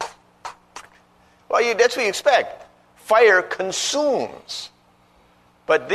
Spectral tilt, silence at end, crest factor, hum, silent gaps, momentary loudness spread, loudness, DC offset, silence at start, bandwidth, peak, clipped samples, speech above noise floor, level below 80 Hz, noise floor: -1.5 dB/octave; 0 s; 18 dB; 60 Hz at -60 dBFS; none; 23 LU; -19 LUFS; under 0.1%; 0 s; 13.5 kHz; -4 dBFS; under 0.1%; 37 dB; -64 dBFS; -56 dBFS